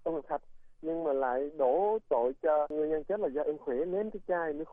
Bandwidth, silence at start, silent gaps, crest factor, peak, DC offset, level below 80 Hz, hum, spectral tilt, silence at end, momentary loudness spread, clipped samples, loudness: 3.7 kHz; 0 s; none; 14 dB; -16 dBFS; under 0.1%; -60 dBFS; none; -9.5 dB/octave; 0 s; 7 LU; under 0.1%; -32 LUFS